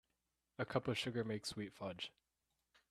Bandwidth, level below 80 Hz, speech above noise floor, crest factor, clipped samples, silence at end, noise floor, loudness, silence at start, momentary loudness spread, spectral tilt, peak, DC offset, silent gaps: 13.5 kHz; -76 dBFS; 45 dB; 26 dB; under 0.1%; 0.8 s; -88 dBFS; -43 LUFS; 0.6 s; 10 LU; -5 dB/octave; -20 dBFS; under 0.1%; none